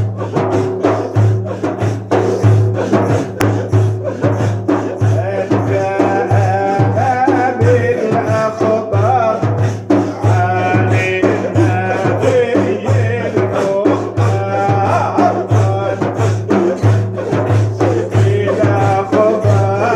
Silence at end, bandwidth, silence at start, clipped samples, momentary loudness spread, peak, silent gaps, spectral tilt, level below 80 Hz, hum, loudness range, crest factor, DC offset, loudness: 0 s; 8.6 kHz; 0 s; under 0.1%; 4 LU; 0 dBFS; none; -8 dB/octave; -48 dBFS; none; 1 LU; 14 dB; under 0.1%; -14 LUFS